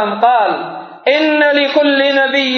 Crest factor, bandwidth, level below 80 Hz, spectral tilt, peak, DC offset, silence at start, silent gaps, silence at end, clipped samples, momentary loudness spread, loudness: 12 dB; 6.6 kHz; -84 dBFS; -4 dB/octave; 0 dBFS; under 0.1%; 0 s; none; 0 s; under 0.1%; 8 LU; -12 LUFS